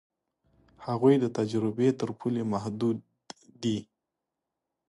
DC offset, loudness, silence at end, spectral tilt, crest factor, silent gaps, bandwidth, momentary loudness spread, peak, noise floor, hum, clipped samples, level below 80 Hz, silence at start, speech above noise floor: under 0.1%; -29 LUFS; 1.05 s; -7.5 dB/octave; 20 dB; none; 11.5 kHz; 18 LU; -10 dBFS; -86 dBFS; none; under 0.1%; -68 dBFS; 0.8 s; 59 dB